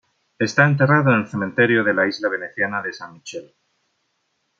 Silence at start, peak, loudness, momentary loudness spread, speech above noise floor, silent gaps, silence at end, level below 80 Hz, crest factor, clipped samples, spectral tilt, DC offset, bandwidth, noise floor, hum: 0.4 s; -2 dBFS; -18 LUFS; 19 LU; 52 dB; none; 1.15 s; -66 dBFS; 20 dB; under 0.1%; -6.5 dB/octave; under 0.1%; 7.6 kHz; -71 dBFS; none